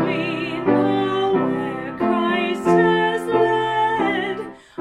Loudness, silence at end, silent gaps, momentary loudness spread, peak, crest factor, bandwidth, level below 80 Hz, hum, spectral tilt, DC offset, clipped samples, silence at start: -20 LUFS; 0 s; none; 8 LU; -4 dBFS; 16 dB; 12 kHz; -56 dBFS; none; -6.5 dB/octave; under 0.1%; under 0.1%; 0 s